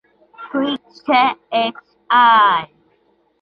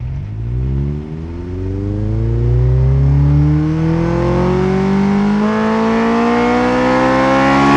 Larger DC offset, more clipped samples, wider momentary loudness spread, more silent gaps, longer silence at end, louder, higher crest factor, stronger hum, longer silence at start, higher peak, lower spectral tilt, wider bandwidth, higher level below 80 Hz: neither; neither; first, 14 LU vs 10 LU; neither; first, 0.75 s vs 0 s; about the same, -16 LUFS vs -14 LUFS; about the same, 16 dB vs 12 dB; neither; first, 0.4 s vs 0 s; about the same, -2 dBFS vs 0 dBFS; second, -5.5 dB/octave vs -8 dB/octave; second, 6 kHz vs 9 kHz; second, -66 dBFS vs -24 dBFS